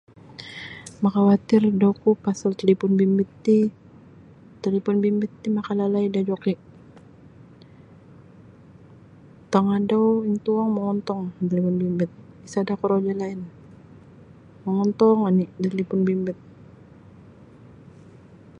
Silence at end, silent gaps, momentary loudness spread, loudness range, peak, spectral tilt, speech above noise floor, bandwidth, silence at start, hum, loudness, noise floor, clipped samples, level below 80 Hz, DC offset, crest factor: 2.25 s; none; 13 LU; 7 LU; -4 dBFS; -8 dB/octave; 27 dB; 9 kHz; 0.3 s; none; -22 LUFS; -48 dBFS; under 0.1%; -62 dBFS; under 0.1%; 20 dB